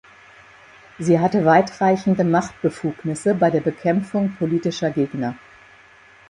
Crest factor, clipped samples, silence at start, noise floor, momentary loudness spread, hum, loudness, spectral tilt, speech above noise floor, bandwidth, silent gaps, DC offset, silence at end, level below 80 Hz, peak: 18 dB; under 0.1%; 1 s; -49 dBFS; 10 LU; none; -20 LUFS; -7 dB/octave; 30 dB; 11 kHz; none; under 0.1%; 0.9 s; -58 dBFS; -2 dBFS